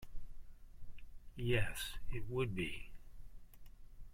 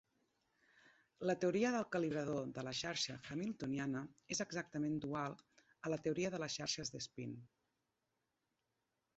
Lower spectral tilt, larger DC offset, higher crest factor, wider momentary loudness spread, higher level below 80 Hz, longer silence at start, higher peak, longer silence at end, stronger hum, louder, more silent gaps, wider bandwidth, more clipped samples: first, -5.5 dB/octave vs -4 dB/octave; neither; about the same, 20 dB vs 18 dB; first, 26 LU vs 10 LU; first, -50 dBFS vs -76 dBFS; second, 0 s vs 1.2 s; about the same, -22 dBFS vs -24 dBFS; second, 0 s vs 1.7 s; neither; about the same, -41 LUFS vs -42 LUFS; neither; first, 16 kHz vs 8 kHz; neither